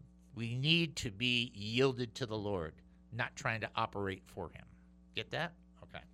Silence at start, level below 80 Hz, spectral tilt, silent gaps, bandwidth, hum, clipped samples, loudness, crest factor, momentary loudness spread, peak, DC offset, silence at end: 0.05 s; -62 dBFS; -4.5 dB/octave; none; 15 kHz; none; under 0.1%; -36 LUFS; 22 dB; 17 LU; -16 dBFS; under 0.1%; 0.1 s